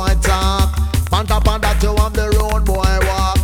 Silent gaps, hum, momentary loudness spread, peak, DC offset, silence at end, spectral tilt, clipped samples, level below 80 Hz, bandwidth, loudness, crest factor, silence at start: none; none; 2 LU; 0 dBFS; under 0.1%; 0 s; -5 dB/octave; under 0.1%; -16 dBFS; 17.5 kHz; -16 LUFS; 14 dB; 0 s